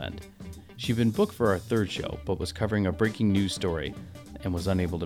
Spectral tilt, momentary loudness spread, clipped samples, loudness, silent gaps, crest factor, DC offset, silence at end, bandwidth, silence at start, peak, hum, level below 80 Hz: -6 dB/octave; 18 LU; under 0.1%; -28 LUFS; none; 16 dB; under 0.1%; 0 s; 16.5 kHz; 0 s; -12 dBFS; none; -46 dBFS